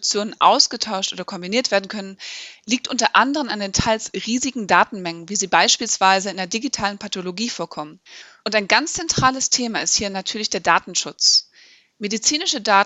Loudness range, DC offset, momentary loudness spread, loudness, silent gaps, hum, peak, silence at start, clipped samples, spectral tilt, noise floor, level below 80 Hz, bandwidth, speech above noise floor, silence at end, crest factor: 3 LU; under 0.1%; 14 LU; -19 LUFS; none; none; 0 dBFS; 0 s; under 0.1%; -1.5 dB/octave; -51 dBFS; -50 dBFS; 8.4 kHz; 31 dB; 0 s; 20 dB